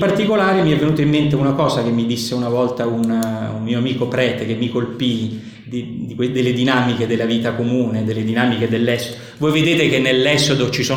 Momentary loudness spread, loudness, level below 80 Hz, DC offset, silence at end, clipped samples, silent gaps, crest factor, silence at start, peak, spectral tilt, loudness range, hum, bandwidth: 8 LU; -17 LUFS; -50 dBFS; under 0.1%; 0 s; under 0.1%; none; 16 dB; 0 s; 0 dBFS; -5.5 dB/octave; 4 LU; none; 17.5 kHz